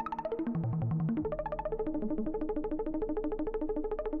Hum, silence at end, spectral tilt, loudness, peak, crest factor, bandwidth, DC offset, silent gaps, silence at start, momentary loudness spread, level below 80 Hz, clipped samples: none; 0 s; -9.5 dB/octave; -35 LUFS; -24 dBFS; 8 dB; 4.5 kHz; under 0.1%; none; 0 s; 3 LU; -44 dBFS; under 0.1%